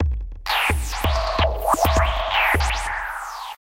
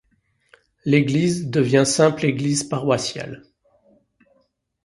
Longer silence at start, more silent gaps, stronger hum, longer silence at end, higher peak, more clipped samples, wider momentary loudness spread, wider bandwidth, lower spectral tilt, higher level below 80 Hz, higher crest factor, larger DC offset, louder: second, 0 s vs 0.85 s; neither; neither; second, 0.1 s vs 1.5 s; about the same, -4 dBFS vs -2 dBFS; neither; second, 10 LU vs 14 LU; first, 17 kHz vs 11.5 kHz; about the same, -4 dB/octave vs -5 dB/octave; first, -26 dBFS vs -58 dBFS; about the same, 16 dB vs 20 dB; neither; about the same, -21 LUFS vs -20 LUFS